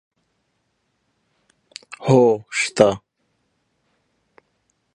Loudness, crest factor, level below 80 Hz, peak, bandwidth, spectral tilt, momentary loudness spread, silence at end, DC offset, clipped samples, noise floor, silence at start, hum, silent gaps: -18 LUFS; 22 dB; -60 dBFS; 0 dBFS; 11 kHz; -5.5 dB/octave; 24 LU; 2 s; under 0.1%; under 0.1%; -70 dBFS; 1.9 s; none; none